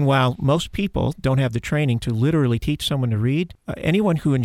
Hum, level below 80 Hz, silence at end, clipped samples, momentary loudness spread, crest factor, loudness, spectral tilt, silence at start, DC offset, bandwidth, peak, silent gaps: none; -40 dBFS; 0 s; under 0.1%; 4 LU; 14 dB; -21 LUFS; -7 dB/octave; 0 s; under 0.1%; 14 kHz; -6 dBFS; none